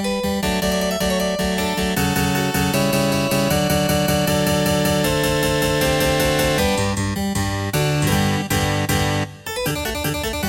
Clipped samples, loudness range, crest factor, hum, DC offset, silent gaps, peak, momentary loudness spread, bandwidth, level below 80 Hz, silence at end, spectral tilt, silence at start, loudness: under 0.1%; 2 LU; 14 dB; none; under 0.1%; none; -6 dBFS; 5 LU; 17 kHz; -34 dBFS; 0 s; -4.5 dB/octave; 0 s; -19 LUFS